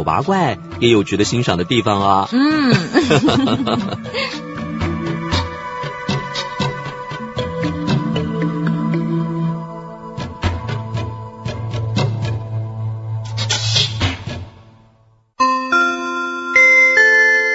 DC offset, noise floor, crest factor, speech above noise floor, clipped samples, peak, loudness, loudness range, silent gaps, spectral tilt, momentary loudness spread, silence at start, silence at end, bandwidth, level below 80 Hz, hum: under 0.1%; -53 dBFS; 18 dB; 38 dB; under 0.1%; 0 dBFS; -17 LUFS; 8 LU; none; -5 dB/octave; 15 LU; 0 s; 0 s; 8 kHz; -42 dBFS; none